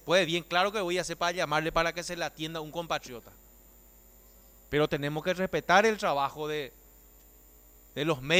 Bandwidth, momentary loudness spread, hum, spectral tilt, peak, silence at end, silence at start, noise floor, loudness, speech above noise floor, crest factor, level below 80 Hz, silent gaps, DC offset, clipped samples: 18 kHz; 12 LU; 60 Hz at -65 dBFS; -4 dB/octave; -10 dBFS; 0 s; 0.05 s; -56 dBFS; -29 LUFS; 27 dB; 20 dB; -56 dBFS; none; under 0.1%; under 0.1%